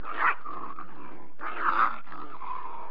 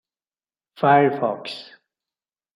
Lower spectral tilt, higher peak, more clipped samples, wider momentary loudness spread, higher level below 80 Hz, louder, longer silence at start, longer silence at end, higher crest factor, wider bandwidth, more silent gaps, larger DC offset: about the same, -6.5 dB/octave vs -7.5 dB/octave; second, -12 dBFS vs -4 dBFS; neither; about the same, 19 LU vs 17 LU; second, -84 dBFS vs -74 dBFS; second, -30 LUFS vs -20 LUFS; second, 0 s vs 0.8 s; second, 0 s vs 0.95 s; about the same, 20 dB vs 20 dB; second, 5.2 kHz vs 11 kHz; neither; first, 4% vs under 0.1%